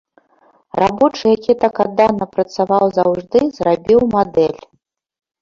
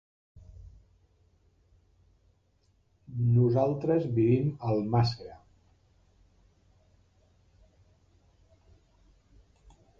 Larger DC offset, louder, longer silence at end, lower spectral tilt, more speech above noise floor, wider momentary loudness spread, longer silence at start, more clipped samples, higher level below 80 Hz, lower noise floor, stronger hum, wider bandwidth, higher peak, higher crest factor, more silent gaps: neither; first, -15 LUFS vs -27 LUFS; second, 0.85 s vs 4.65 s; second, -7 dB/octave vs -9.5 dB/octave; first, 50 dB vs 42 dB; second, 6 LU vs 21 LU; first, 0.75 s vs 0.35 s; neither; first, -50 dBFS vs -58 dBFS; second, -64 dBFS vs -69 dBFS; neither; about the same, 7.4 kHz vs 7 kHz; first, -2 dBFS vs -12 dBFS; second, 14 dB vs 20 dB; neither